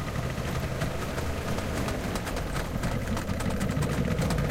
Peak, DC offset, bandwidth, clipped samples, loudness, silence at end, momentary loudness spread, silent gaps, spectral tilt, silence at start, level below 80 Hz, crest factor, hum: -14 dBFS; under 0.1%; 16.5 kHz; under 0.1%; -31 LUFS; 0 s; 4 LU; none; -5.5 dB/octave; 0 s; -36 dBFS; 14 dB; none